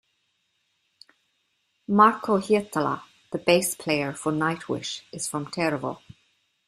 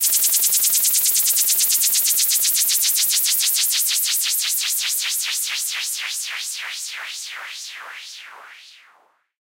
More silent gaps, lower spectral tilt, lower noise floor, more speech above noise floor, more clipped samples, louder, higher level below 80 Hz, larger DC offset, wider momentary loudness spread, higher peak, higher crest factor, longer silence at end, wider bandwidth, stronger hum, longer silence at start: neither; first, -4.5 dB/octave vs 5 dB/octave; first, -73 dBFS vs -58 dBFS; first, 49 dB vs 24 dB; neither; second, -25 LUFS vs -16 LUFS; first, -66 dBFS vs -72 dBFS; neither; about the same, 15 LU vs 16 LU; about the same, -4 dBFS vs -4 dBFS; about the same, 22 dB vs 18 dB; about the same, 0.7 s vs 0.75 s; about the same, 15 kHz vs 16.5 kHz; neither; first, 1.9 s vs 0 s